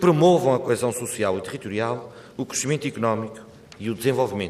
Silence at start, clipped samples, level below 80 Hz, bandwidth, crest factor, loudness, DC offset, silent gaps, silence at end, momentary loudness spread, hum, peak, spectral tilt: 0 s; under 0.1%; -62 dBFS; 15 kHz; 18 dB; -23 LUFS; under 0.1%; none; 0 s; 16 LU; none; -6 dBFS; -5.5 dB/octave